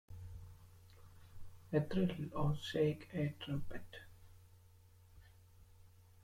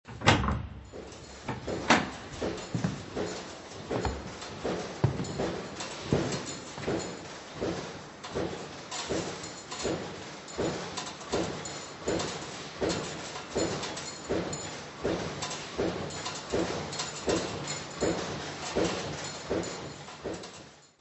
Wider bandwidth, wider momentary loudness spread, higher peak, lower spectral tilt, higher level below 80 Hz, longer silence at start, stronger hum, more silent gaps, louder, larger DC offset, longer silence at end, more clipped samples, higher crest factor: first, 16 kHz vs 8.4 kHz; first, 25 LU vs 10 LU; second, -22 dBFS vs -4 dBFS; first, -7.5 dB/octave vs -4 dB/octave; second, -58 dBFS vs -50 dBFS; about the same, 0.1 s vs 0.05 s; neither; neither; second, -39 LUFS vs -33 LUFS; neither; about the same, 0.25 s vs 0.15 s; neither; second, 20 dB vs 28 dB